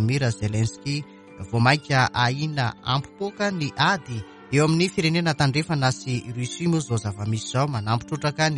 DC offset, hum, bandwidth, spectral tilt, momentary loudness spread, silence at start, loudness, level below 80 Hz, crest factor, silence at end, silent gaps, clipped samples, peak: under 0.1%; none; 11.5 kHz; -5 dB/octave; 9 LU; 0 s; -24 LUFS; -52 dBFS; 20 dB; 0 s; none; under 0.1%; -4 dBFS